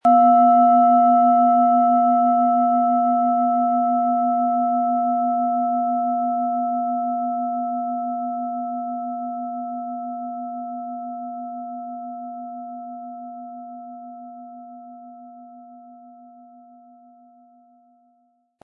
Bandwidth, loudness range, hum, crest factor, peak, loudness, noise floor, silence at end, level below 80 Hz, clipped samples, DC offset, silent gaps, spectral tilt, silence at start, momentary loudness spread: 3.1 kHz; 21 LU; none; 16 dB; -6 dBFS; -20 LUFS; -65 dBFS; 2.55 s; -82 dBFS; under 0.1%; under 0.1%; none; -9.5 dB/octave; 0.05 s; 22 LU